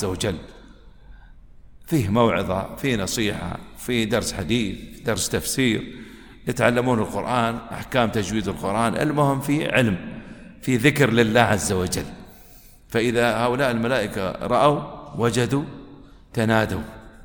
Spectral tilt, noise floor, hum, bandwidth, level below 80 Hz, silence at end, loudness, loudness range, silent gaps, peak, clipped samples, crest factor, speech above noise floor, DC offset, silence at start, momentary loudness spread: -5 dB/octave; -47 dBFS; none; over 20 kHz; -44 dBFS; 0 s; -22 LUFS; 4 LU; none; 0 dBFS; under 0.1%; 22 dB; 26 dB; under 0.1%; 0 s; 14 LU